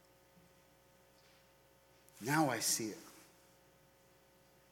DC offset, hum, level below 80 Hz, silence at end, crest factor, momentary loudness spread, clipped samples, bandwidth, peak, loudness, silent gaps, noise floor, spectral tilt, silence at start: under 0.1%; none; -80 dBFS; 1.5 s; 24 dB; 24 LU; under 0.1%; 19 kHz; -20 dBFS; -36 LUFS; none; -68 dBFS; -3 dB/octave; 2.15 s